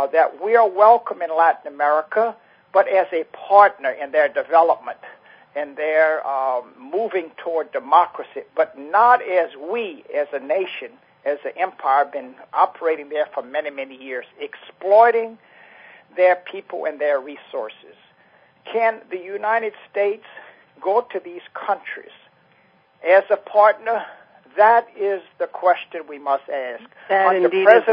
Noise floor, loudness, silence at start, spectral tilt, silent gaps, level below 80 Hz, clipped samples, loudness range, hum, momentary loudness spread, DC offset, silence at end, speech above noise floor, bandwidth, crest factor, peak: -57 dBFS; -19 LUFS; 0 s; -6.5 dB/octave; none; -78 dBFS; under 0.1%; 7 LU; none; 17 LU; under 0.1%; 0 s; 38 dB; 5.2 kHz; 20 dB; 0 dBFS